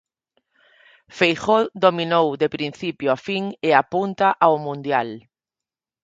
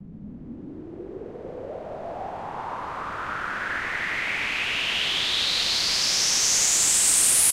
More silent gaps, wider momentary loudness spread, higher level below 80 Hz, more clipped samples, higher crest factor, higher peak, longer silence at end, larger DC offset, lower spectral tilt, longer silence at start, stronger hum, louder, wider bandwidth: neither; second, 9 LU vs 22 LU; second, -64 dBFS vs -52 dBFS; neither; about the same, 22 dB vs 18 dB; first, 0 dBFS vs -8 dBFS; first, 0.85 s vs 0 s; neither; first, -5.5 dB/octave vs 0.5 dB/octave; first, 1.15 s vs 0 s; neither; about the same, -20 LUFS vs -21 LUFS; second, 7.8 kHz vs 16 kHz